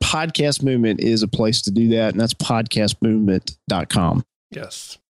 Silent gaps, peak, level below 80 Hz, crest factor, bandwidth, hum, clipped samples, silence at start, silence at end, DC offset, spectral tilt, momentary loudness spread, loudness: 4.36-4.50 s; -6 dBFS; -42 dBFS; 14 dB; 12.5 kHz; none; under 0.1%; 0 s; 0.2 s; under 0.1%; -5 dB/octave; 14 LU; -19 LUFS